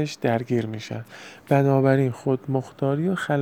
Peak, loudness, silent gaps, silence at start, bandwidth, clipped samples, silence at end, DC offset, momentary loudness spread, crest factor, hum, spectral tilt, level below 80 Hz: -6 dBFS; -23 LUFS; none; 0 s; 13.5 kHz; under 0.1%; 0 s; under 0.1%; 16 LU; 18 dB; none; -7.5 dB/octave; -68 dBFS